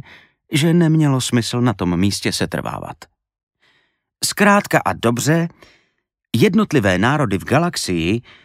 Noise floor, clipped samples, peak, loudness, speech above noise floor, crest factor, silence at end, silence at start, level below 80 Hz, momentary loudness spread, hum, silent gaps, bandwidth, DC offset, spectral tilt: -70 dBFS; under 0.1%; 0 dBFS; -17 LUFS; 53 dB; 18 dB; 0.25 s; 0.5 s; -48 dBFS; 9 LU; none; 3.43-3.47 s; 16 kHz; under 0.1%; -5 dB/octave